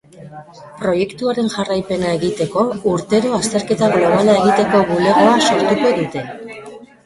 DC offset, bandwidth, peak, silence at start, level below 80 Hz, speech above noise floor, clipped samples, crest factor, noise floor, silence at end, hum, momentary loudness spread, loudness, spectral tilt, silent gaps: under 0.1%; 11.5 kHz; -2 dBFS; 0.15 s; -50 dBFS; 21 dB; under 0.1%; 14 dB; -36 dBFS; 0.2 s; none; 11 LU; -15 LUFS; -5 dB/octave; none